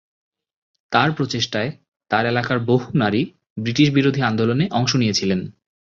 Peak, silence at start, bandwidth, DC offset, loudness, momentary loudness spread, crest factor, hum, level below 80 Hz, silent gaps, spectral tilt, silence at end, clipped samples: -2 dBFS; 0.9 s; 7.6 kHz; under 0.1%; -20 LUFS; 8 LU; 18 dB; none; -54 dBFS; 1.88-1.92 s, 3.50-3.56 s; -5.5 dB/octave; 0.45 s; under 0.1%